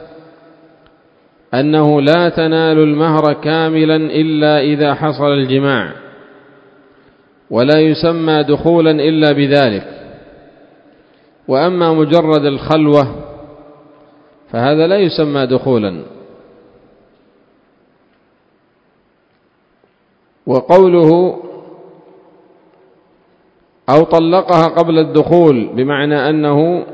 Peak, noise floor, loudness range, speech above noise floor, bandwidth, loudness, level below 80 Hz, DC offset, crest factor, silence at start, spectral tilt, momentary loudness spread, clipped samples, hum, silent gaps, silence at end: 0 dBFS; -56 dBFS; 5 LU; 45 dB; 8 kHz; -12 LUFS; -50 dBFS; under 0.1%; 14 dB; 0 s; -8.5 dB/octave; 10 LU; 0.2%; none; none; 0 s